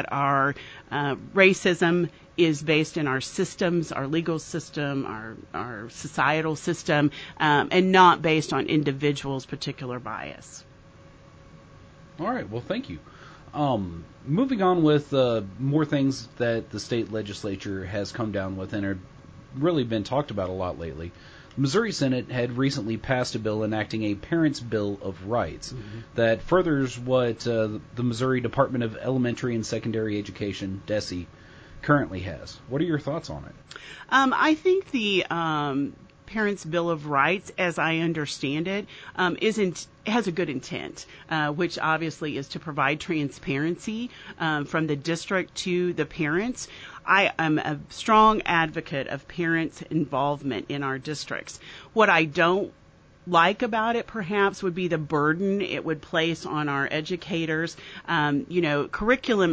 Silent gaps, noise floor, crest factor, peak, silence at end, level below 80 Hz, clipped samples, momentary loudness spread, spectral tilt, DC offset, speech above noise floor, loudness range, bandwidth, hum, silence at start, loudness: none; -50 dBFS; 20 dB; -4 dBFS; 0 s; -52 dBFS; under 0.1%; 13 LU; -5.5 dB/octave; under 0.1%; 25 dB; 6 LU; 8 kHz; none; 0 s; -25 LUFS